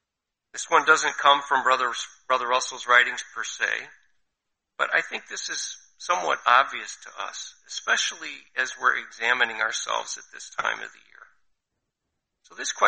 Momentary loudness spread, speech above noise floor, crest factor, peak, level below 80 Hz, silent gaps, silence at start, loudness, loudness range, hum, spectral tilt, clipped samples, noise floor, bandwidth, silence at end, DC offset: 16 LU; 59 dB; 22 dB; -4 dBFS; -74 dBFS; none; 0.55 s; -24 LUFS; 7 LU; none; 0.5 dB/octave; under 0.1%; -84 dBFS; 8.8 kHz; 0 s; under 0.1%